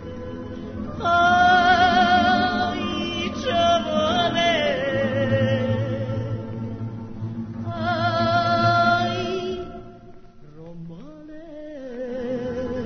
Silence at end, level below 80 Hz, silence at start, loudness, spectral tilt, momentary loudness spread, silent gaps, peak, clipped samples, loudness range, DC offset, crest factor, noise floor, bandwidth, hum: 0 s; -48 dBFS; 0 s; -21 LUFS; -5.5 dB/octave; 21 LU; none; -6 dBFS; under 0.1%; 9 LU; under 0.1%; 18 dB; -43 dBFS; 6.6 kHz; none